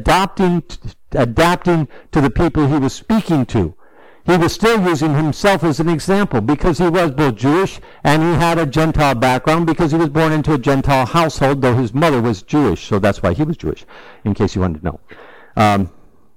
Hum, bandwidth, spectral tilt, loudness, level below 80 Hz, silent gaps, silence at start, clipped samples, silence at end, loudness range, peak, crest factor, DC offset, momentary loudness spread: none; 17 kHz; -6.5 dB/octave; -16 LUFS; -32 dBFS; none; 0 s; under 0.1%; 0.35 s; 3 LU; -4 dBFS; 12 dB; under 0.1%; 8 LU